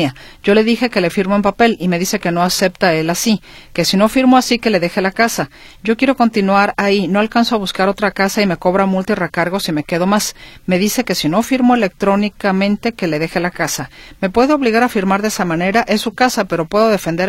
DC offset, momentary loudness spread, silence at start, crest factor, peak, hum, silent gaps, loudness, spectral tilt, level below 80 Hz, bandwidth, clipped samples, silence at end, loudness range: under 0.1%; 6 LU; 0 s; 14 dB; 0 dBFS; none; none; -15 LUFS; -4.5 dB/octave; -44 dBFS; 16.5 kHz; under 0.1%; 0 s; 2 LU